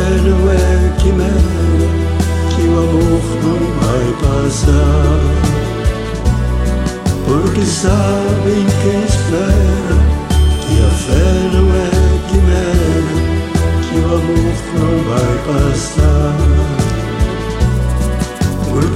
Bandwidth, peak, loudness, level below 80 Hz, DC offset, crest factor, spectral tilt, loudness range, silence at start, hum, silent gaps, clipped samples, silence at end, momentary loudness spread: 13 kHz; 0 dBFS; -14 LUFS; -16 dBFS; under 0.1%; 12 dB; -6.5 dB/octave; 2 LU; 0 s; none; none; under 0.1%; 0 s; 4 LU